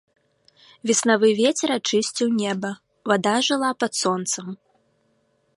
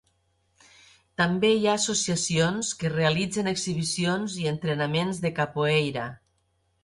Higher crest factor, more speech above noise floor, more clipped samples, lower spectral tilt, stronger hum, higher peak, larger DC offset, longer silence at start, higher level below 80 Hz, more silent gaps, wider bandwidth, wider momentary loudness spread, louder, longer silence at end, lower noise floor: about the same, 20 dB vs 16 dB; about the same, 45 dB vs 45 dB; neither; about the same, -3 dB/octave vs -4 dB/octave; neither; first, -4 dBFS vs -10 dBFS; neither; second, 0.85 s vs 1.2 s; second, -72 dBFS vs -60 dBFS; neither; about the same, 11.5 kHz vs 11.5 kHz; first, 13 LU vs 6 LU; first, -21 LUFS vs -25 LUFS; first, 1 s vs 0.7 s; second, -66 dBFS vs -71 dBFS